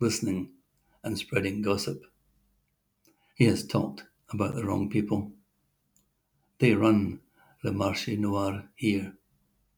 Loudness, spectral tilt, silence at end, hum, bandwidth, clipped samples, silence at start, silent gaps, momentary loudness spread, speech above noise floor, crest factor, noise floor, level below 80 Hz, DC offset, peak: -28 LUFS; -6 dB/octave; 0.65 s; none; over 20 kHz; under 0.1%; 0 s; none; 16 LU; 47 dB; 22 dB; -75 dBFS; -64 dBFS; under 0.1%; -8 dBFS